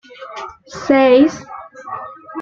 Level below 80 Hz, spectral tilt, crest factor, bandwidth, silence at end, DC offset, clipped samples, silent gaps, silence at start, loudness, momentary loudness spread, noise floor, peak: -56 dBFS; -5 dB/octave; 16 dB; 7.4 kHz; 0 s; under 0.1%; under 0.1%; none; 0.2 s; -12 LUFS; 22 LU; -32 dBFS; -2 dBFS